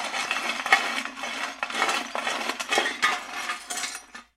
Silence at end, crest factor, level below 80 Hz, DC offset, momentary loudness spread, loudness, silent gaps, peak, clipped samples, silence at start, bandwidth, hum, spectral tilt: 0.15 s; 26 dB; -70 dBFS; under 0.1%; 10 LU; -26 LUFS; none; -2 dBFS; under 0.1%; 0 s; 16.5 kHz; none; 0.5 dB/octave